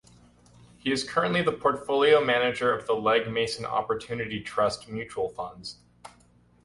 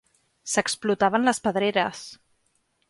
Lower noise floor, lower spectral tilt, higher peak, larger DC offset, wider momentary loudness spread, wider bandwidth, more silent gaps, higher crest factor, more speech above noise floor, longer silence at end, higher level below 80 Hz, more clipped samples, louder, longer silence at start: second, -60 dBFS vs -70 dBFS; about the same, -4.5 dB/octave vs -3.5 dB/octave; about the same, -10 dBFS vs -8 dBFS; neither; second, 14 LU vs 19 LU; about the same, 11.5 kHz vs 11.5 kHz; neither; about the same, 18 dB vs 18 dB; second, 34 dB vs 46 dB; second, 0.55 s vs 0.75 s; about the same, -60 dBFS vs -64 dBFS; neither; about the same, -26 LUFS vs -24 LUFS; first, 0.85 s vs 0.45 s